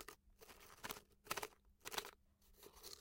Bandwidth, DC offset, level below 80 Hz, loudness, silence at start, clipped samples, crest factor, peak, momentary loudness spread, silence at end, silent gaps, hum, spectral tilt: 17 kHz; under 0.1%; -72 dBFS; -51 LUFS; 0 s; under 0.1%; 30 dB; -24 dBFS; 16 LU; 0 s; none; none; -1 dB/octave